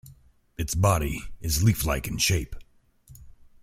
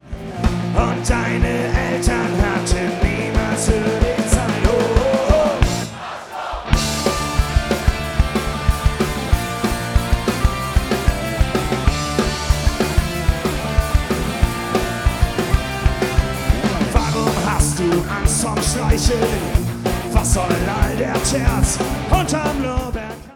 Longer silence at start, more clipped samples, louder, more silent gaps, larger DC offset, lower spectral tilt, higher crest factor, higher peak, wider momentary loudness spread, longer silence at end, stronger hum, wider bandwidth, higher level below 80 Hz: about the same, 0.05 s vs 0.05 s; neither; second, -25 LUFS vs -19 LUFS; neither; neither; about the same, -4.5 dB/octave vs -5 dB/octave; about the same, 20 dB vs 18 dB; second, -8 dBFS vs 0 dBFS; first, 12 LU vs 4 LU; first, 0.3 s vs 0 s; neither; second, 16.5 kHz vs 18.5 kHz; second, -38 dBFS vs -22 dBFS